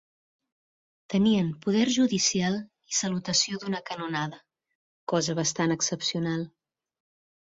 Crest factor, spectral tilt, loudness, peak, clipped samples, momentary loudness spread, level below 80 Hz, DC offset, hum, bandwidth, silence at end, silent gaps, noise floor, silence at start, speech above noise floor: 18 dB; -3.5 dB/octave; -27 LUFS; -10 dBFS; under 0.1%; 9 LU; -66 dBFS; under 0.1%; none; 7.8 kHz; 1.05 s; 4.75-5.07 s; under -90 dBFS; 1.1 s; over 63 dB